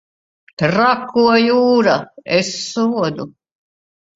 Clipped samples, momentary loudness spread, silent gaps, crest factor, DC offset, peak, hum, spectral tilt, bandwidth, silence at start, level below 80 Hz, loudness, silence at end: under 0.1%; 9 LU; none; 16 dB; under 0.1%; 0 dBFS; none; -5 dB/octave; 7.8 kHz; 0.6 s; -58 dBFS; -15 LUFS; 0.9 s